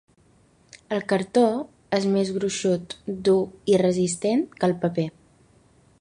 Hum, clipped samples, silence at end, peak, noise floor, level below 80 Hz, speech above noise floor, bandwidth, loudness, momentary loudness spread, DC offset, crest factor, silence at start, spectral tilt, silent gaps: none; under 0.1%; 0.9 s; -8 dBFS; -59 dBFS; -60 dBFS; 36 dB; 11 kHz; -24 LUFS; 9 LU; under 0.1%; 18 dB; 0.9 s; -5.5 dB/octave; none